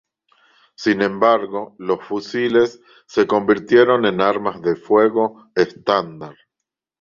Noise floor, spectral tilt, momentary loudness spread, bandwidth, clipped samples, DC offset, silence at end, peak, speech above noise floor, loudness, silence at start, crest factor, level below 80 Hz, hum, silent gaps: -82 dBFS; -6 dB/octave; 10 LU; 7.4 kHz; under 0.1%; under 0.1%; 0.7 s; -2 dBFS; 65 dB; -18 LUFS; 0.8 s; 18 dB; -60 dBFS; none; none